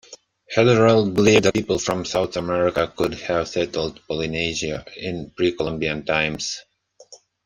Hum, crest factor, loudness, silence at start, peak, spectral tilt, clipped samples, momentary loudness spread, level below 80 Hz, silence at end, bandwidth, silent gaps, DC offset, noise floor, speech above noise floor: none; 20 dB; -21 LUFS; 0.1 s; -2 dBFS; -5 dB/octave; under 0.1%; 13 LU; -48 dBFS; 0.3 s; 15.5 kHz; none; under 0.1%; -49 dBFS; 28 dB